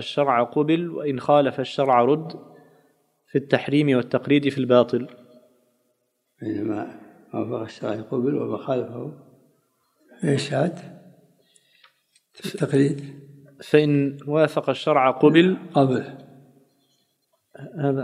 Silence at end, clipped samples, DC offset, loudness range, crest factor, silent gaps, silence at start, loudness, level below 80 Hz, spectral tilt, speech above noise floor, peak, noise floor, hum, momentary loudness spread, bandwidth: 0 s; under 0.1%; under 0.1%; 10 LU; 22 dB; none; 0 s; -22 LUFS; -74 dBFS; -7 dB/octave; 51 dB; -2 dBFS; -72 dBFS; none; 17 LU; 12.5 kHz